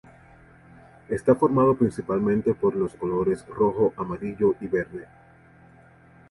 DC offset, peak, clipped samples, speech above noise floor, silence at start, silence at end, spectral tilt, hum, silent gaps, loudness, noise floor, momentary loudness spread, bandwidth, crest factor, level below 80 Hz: under 0.1%; -6 dBFS; under 0.1%; 30 dB; 1.1 s; 1.25 s; -9 dB/octave; none; none; -24 LUFS; -53 dBFS; 11 LU; 11.5 kHz; 18 dB; -54 dBFS